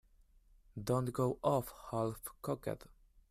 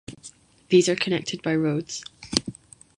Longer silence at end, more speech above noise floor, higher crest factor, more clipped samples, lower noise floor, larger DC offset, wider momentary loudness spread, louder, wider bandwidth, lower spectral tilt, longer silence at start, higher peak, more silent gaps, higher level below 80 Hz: about the same, 0.55 s vs 0.45 s; about the same, 29 dB vs 27 dB; about the same, 20 dB vs 24 dB; neither; first, -66 dBFS vs -49 dBFS; neither; second, 11 LU vs 19 LU; second, -38 LUFS vs -24 LUFS; first, 15.5 kHz vs 11.5 kHz; first, -7 dB/octave vs -4.5 dB/octave; first, 0.75 s vs 0.1 s; second, -18 dBFS vs -2 dBFS; neither; about the same, -62 dBFS vs -58 dBFS